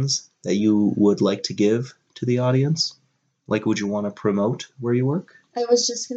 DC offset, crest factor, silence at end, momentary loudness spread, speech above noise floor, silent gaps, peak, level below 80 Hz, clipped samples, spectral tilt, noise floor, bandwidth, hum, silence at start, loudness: under 0.1%; 16 dB; 0 s; 9 LU; 46 dB; none; -6 dBFS; -70 dBFS; under 0.1%; -5.5 dB/octave; -67 dBFS; 8.2 kHz; none; 0 s; -22 LUFS